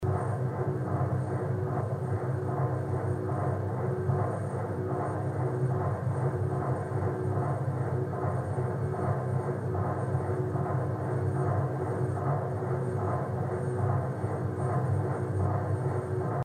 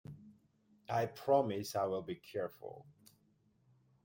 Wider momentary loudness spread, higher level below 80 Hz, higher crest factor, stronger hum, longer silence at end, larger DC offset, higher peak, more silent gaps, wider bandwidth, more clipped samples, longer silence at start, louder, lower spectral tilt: second, 2 LU vs 21 LU; first, -58 dBFS vs -78 dBFS; second, 14 dB vs 22 dB; neither; second, 0 s vs 1.15 s; neither; about the same, -16 dBFS vs -18 dBFS; neither; second, 9.4 kHz vs 16.5 kHz; neither; about the same, 0 s vs 0.1 s; first, -31 LUFS vs -37 LUFS; first, -9.5 dB/octave vs -6 dB/octave